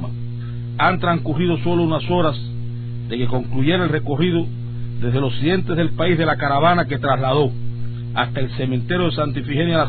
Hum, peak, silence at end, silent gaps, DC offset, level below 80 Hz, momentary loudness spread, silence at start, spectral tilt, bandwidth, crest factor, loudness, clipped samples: 60 Hz at -40 dBFS; -4 dBFS; 0 s; none; under 0.1%; -40 dBFS; 11 LU; 0 s; -11 dB/octave; 4.5 kHz; 16 dB; -20 LUFS; under 0.1%